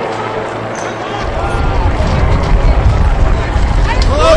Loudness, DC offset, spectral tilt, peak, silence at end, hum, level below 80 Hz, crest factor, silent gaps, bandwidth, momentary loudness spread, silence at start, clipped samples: -14 LUFS; under 0.1%; -6 dB/octave; 0 dBFS; 0 s; none; -14 dBFS; 12 dB; none; 10.5 kHz; 7 LU; 0 s; under 0.1%